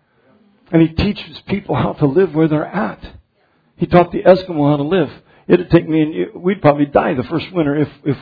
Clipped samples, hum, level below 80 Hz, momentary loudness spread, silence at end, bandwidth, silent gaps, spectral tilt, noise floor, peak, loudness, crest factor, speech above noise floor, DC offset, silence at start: under 0.1%; none; -40 dBFS; 10 LU; 0 s; 5 kHz; none; -10 dB/octave; -59 dBFS; 0 dBFS; -16 LUFS; 16 dB; 44 dB; under 0.1%; 0.7 s